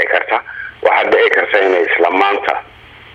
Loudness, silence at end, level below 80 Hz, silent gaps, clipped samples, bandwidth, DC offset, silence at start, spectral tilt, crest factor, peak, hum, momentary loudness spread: -13 LUFS; 0.5 s; -54 dBFS; none; under 0.1%; 7.4 kHz; under 0.1%; 0 s; -4 dB/octave; 14 dB; 0 dBFS; none; 8 LU